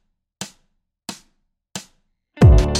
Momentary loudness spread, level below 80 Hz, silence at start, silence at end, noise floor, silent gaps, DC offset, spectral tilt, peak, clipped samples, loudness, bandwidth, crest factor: 23 LU; -22 dBFS; 0.4 s; 0 s; -67 dBFS; none; under 0.1%; -6 dB/octave; -2 dBFS; under 0.1%; -14 LUFS; 13 kHz; 18 dB